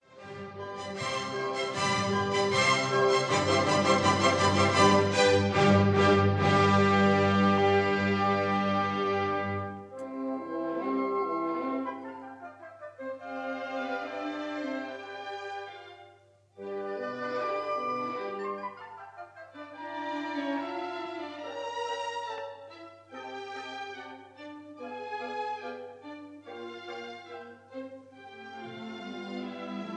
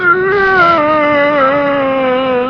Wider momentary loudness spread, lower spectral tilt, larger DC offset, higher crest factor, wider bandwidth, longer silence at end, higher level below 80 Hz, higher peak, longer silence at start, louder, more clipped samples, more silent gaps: first, 22 LU vs 4 LU; second, -5 dB/octave vs -6.5 dB/octave; neither; first, 20 dB vs 10 dB; first, 10.5 kHz vs 6.4 kHz; about the same, 0 s vs 0 s; second, -68 dBFS vs -44 dBFS; second, -10 dBFS vs 0 dBFS; about the same, 0.1 s vs 0 s; second, -28 LUFS vs -10 LUFS; neither; neither